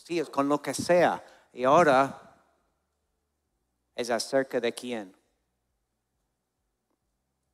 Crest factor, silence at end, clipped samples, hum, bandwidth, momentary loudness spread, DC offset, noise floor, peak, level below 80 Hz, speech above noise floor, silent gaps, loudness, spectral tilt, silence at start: 22 dB; 2.45 s; under 0.1%; none; 15 kHz; 16 LU; under 0.1%; -80 dBFS; -8 dBFS; -72 dBFS; 54 dB; none; -26 LUFS; -4.5 dB/octave; 0.1 s